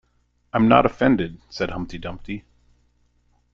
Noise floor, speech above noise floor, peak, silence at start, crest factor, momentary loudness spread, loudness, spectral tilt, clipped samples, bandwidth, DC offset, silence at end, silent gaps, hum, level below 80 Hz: -65 dBFS; 45 dB; -2 dBFS; 0.55 s; 22 dB; 18 LU; -21 LUFS; -7.5 dB/octave; under 0.1%; 7.2 kHz; under 0.1%; 1.15 s; none; 60 Hz at -45 dBFS; -44 dBFS